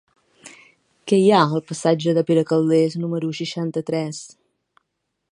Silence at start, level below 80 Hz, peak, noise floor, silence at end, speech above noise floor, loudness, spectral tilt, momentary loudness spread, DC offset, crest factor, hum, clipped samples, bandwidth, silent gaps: 0.45 s; -70 dBFS; 0 dBFS; -76 dBFS; 1.05 s; 57 dB; -20 LUFS; -6 dB/octave; 10 LU; under 0.1%; 20 dB; none; under 0.1%; 11 kHz; none